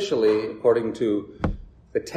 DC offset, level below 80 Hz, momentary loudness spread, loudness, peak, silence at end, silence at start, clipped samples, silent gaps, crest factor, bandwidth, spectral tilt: under 0.1%; -42 dBFS; 10 LU; -24 LUFS; -6 dBFS; 0 s; 0 s; under 0.1%; none; 18 dB; 9.6 kHz; -6 dB/octave